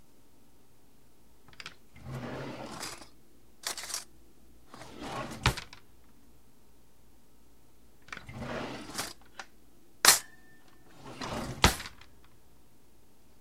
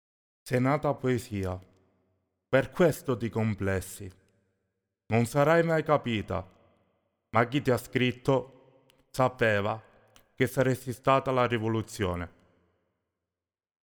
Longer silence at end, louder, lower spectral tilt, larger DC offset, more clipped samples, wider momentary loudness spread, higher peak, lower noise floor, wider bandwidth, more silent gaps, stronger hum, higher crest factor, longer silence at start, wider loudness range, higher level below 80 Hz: second, 1.45 s vs 1.65 s; second, -31 LUFS vs -28 LUFS; second, -2 dB/octave vs -6.5 dB/octave; first, 0.3% vs under 0.1%; neither; first, 25 LU vs 11 LU; first, -2 dBFS vs -10 dBFS; second, -63 dBFS vs under -90 dBFS; second, 16 kHz vs over 20 kHz; neither; neither; first, 36 dB vs 20 dB; first, 1.6 s vs 0.45 s; first, 16 LU vs 3 LU; first, -48 dBFS vs -58 dBFS